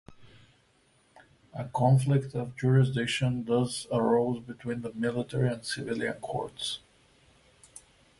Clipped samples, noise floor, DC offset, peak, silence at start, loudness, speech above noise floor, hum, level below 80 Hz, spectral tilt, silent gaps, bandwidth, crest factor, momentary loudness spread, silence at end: under 0.1%; -66 dBFS; under 0.1%; -12 dBFS; 0.1 s; -29 LUFS; 38 dB; none; -62 dBFS; -6 dB/octave; none; 11.5 kHz; 18 dB; 11 LU; 0.4 s